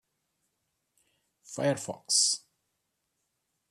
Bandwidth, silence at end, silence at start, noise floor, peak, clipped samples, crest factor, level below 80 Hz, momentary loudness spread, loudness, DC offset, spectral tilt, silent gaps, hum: 14 kHz; 1.35 s; 1.5 s; -81 dBFS; -12 dBFS; under 0.1%; 24 dB; -78 dBFS; 11 LU; -28 LUFS; under 0.1%; -2 dB/octave; none; none